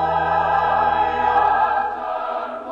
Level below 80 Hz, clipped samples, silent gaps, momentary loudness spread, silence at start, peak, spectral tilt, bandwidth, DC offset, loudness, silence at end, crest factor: -48 dBFS; under 0.1%; none; 8 LU; 0 s; -6 dBFS; -6 dB/octave; 7 kHz; under 0.1%; -19 LUFS; 0 s; 12 dB